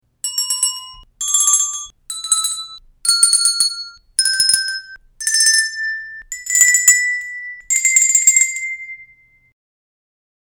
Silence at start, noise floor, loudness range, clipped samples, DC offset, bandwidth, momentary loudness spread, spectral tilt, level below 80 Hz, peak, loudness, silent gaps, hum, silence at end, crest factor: 0.25 s; -50 dBFS; 3 LU; under 0.1%; under 0.1%; over 20 kHz; 18 LU; 6 dB/octave; -56 dBFS; 0 dBFS; -13 LUFS; none; none; 1.4 s; 18 dB